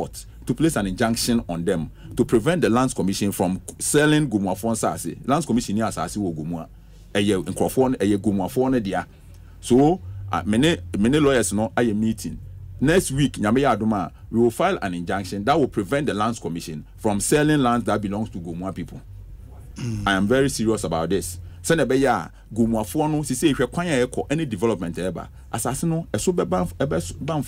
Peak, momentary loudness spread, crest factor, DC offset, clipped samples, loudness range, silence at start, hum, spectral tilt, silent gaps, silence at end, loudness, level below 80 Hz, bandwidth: -6 dBFS; 12 LU; 16 dB; under 0.1%; under 0.1%; 3 LU; 0 s; none; -5.5 dB/octave; none; 0 s; -22 LUFS; -42 dBFS; 16 kHz